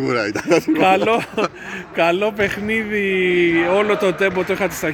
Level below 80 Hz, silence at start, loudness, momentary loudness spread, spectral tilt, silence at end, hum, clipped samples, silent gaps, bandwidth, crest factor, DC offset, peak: -50 dBFS; 0 s; -18 LUFS; 7 LU; -5 dB/octave; 0 s; none; under 0.1%; none; 18 kHz; 16 dB; under 0.1%; -2 dBFS